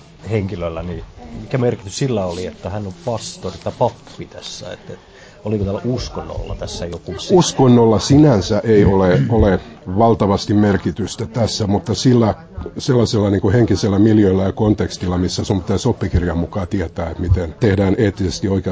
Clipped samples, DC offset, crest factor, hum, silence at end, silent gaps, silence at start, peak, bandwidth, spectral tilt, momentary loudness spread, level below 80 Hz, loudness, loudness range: under 0.1%; under 0.1%; 14 dB; none; 0 s; none; 0.25 s; -2 dBFS; 8 kHz; -6.5 dB/octave; 15 LU; -32 dBFS; -17 LUFS; 11 LU